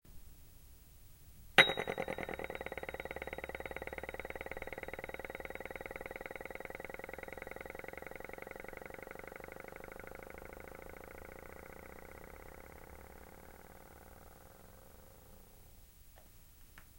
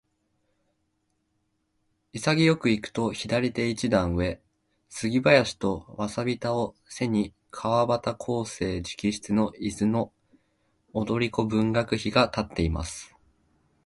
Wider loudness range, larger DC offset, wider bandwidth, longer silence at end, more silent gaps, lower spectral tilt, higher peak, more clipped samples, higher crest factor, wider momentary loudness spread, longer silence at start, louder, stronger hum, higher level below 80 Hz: first, 21 LU vs 3 LU; neither; first, 16.5 kHz vs 11.5 kHz; second, 0 s vs 0.8 s; neither; second, -3 dB/octave vs -5.5 dB/octave; second, -8 dBFS vs -4 dBFS; neither; first, 36 dB vs 24 dB; first, 18 LU vs 11 LU; second, 0.05 s vs 2.15 s; second, -40 LUFS vs -26 LUFS; neither; second, -58 dBFS vs -46 dBFS